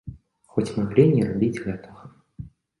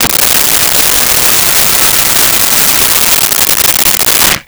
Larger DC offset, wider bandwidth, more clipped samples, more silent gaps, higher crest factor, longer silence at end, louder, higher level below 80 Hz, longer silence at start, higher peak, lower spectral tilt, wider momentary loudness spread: neither; second, 11.5 kHz vs over 20 kHz; neither; neither; first, 22 dB vs 8 dB; first, 0.35 s vs 0.05 s; second, -22 LUFS vs -5 LUFS; second, -52 dBFS vs -32 dBFS; about the same, 0.05 s vs 0 s; second, -4 dBFS vs 0 dBFS; first, -8.5 dB/octave vs 0 dB/octave; first, 25 LU vs 1 LU